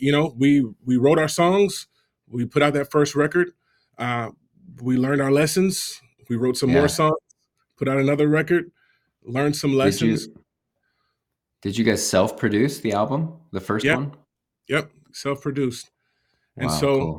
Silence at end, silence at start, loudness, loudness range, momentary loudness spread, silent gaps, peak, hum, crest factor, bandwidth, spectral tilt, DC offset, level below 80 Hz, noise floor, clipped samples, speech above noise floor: 0 s; 0 s; -21 LUFS; 4 LU; 12 LU; none; -2 dBFS; none; 20 dB; 18 kHz; -5.5 dB/octave; under 0.1%; -56 dBFS; -80 dBFS; under 0.1%; 59 dB